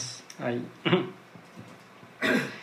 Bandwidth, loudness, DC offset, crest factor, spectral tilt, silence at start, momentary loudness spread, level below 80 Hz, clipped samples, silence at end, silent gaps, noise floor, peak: 15.5 kHz; -29 LUFS; under 0.1%; 22 dB; -4.5 dB/octave; 0 s; 22 LU; -76 dBFS; under 0.1%; 0 s; none; -50 dBFS; -10 dBFS